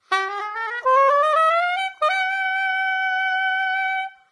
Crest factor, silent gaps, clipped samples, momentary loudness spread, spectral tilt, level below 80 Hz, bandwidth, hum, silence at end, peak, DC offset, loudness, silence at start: 14 dB; none; under 0.1%; 8 LU; 1 dB/octave; -82 dBFS; 11 kHz; none; 0.2 s; -6 dBFS; under 0.1%; -20 LUFS; 0.1 s